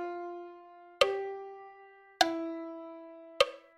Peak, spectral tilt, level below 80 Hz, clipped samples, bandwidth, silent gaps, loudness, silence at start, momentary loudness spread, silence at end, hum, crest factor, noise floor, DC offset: -8 dBFS; -2 dB/octave; -68 dBFS; under 0.1%; 15.5 kHz; none; -32 LUFS; 0 s; 21 LU; 0.2 s; none; 26 dB; -56 dBFS; under 0.1%